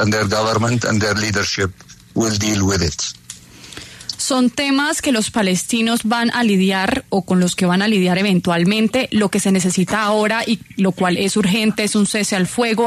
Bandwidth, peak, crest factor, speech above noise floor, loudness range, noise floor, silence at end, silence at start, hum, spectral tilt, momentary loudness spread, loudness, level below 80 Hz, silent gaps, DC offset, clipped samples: 13.5 kHz; -4 dBFS; 12 dB; 22 dB; 3 LU; -38 dBFS; 0 s; 0 s; none; -4.5 dB/octave; 7 LU; -17 LUFS; -46 dBFS; none; under 0.1%; under 0.1%